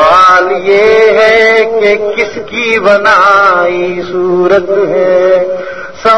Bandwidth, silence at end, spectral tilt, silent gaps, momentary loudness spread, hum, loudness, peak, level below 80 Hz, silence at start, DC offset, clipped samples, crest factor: 11 kHz; 0 s; -4.5 dB/octave; none; 9 LU; none; -7 LUFS; 0 dBFS; -44 dBFS; 0 s; 2%; 1%; 8 dB